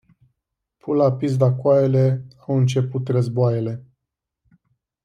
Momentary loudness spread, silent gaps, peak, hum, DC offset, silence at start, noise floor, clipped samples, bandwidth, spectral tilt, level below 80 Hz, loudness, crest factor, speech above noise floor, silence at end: 11 LU; none; -4 dBFS; none; under 0.1%; 0.85 s; -83 dBFS; under 0.1%; 8.6 kHz; -8.5 dB/octave; -62 dBFS; -20 LUFS; 16 dB; 64 dB; 1.25 s